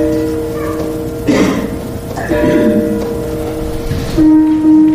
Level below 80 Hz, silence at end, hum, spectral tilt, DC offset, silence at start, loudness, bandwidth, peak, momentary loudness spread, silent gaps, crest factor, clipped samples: -28 dBFS; 0 s; none; -7 dB/octave; under 0.1%; 0 s; -14 LUFS; 15.5 kHz; -2 dBFS; 11 LU; none; 10 dB; under 0.1%